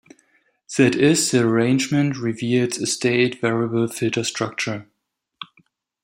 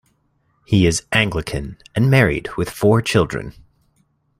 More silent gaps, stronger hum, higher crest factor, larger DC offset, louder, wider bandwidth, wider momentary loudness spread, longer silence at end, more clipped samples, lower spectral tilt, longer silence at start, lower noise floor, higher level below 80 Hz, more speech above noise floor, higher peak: neither; neither; about the same, 18 dB vs 18 dB; neither; about the same, -20 LUFS vs -18 LUFS; about the same, 16 kHz vs 15.5 kHz; about the same, 13 LU vs 12 LU; second, 0.6 s vs 0.9 s; neither; about the same, -4.5 dB/octave vs -5.5 dB/octave; about the same, 0.7 s vs 0.7 s; first, -77 dBFS vs -64 dBFS; second, -62 dBFS vs -40 dBFS; first, 58 dB vs 46 dB; about the same, -2 dBFS vs 0 dBFS